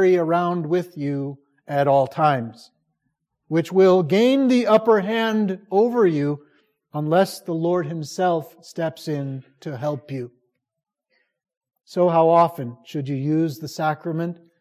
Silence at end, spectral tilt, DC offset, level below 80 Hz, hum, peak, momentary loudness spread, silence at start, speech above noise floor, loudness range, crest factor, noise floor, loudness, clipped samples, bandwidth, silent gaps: 0.25 s; -7 dB/octave; under 0.1%; -72 dBFS; none; -4 dBFS; 15 LU; 0 s; 55 dB; 9 LU; 18 dB; -76 dBFS; -21 LUFS; under 0.1%; 15.5 kHz; 11.57-11.61 s